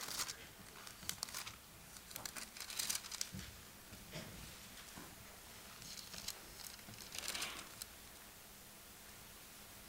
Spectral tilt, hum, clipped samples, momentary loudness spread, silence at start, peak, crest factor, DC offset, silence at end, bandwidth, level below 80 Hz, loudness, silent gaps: -1 dB/octave; none; under 0.1%; 13 LU; 0 s; -18 dBFS; 32 dB; under 0.1%; 0 s; 17 kHz; -68 dBFS; -48 LUFS; none